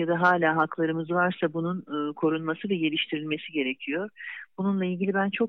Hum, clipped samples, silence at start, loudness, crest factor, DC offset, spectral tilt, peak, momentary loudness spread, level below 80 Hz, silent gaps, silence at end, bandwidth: none; under 0.1%; 0 s; -27 LUFS; 18 dB; under 0.1%; -8 dB/octave; -10 dBFS; 9 LU; -82 dBFS; none; 0 s; 6.2 kHz